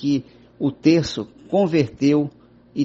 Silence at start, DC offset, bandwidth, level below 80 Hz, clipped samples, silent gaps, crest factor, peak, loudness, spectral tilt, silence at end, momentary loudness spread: 0 s; under 0.1%; 7.8 kHz; -52 dBFS; under 0.1%; none; 18 dB; -4 dBFS; -21 LUFS; -7 dB/octave; 0 s; 12 LU